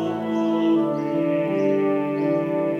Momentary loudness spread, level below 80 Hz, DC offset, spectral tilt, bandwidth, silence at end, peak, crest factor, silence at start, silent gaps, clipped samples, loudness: 3 LU; -74 dBFS; under 0.1%; -8.5 dB/octave; 6.8 kHz; 0 s; -10 dBFS; 12 dB; 0 s; none; under 0.1%; -22 LUFS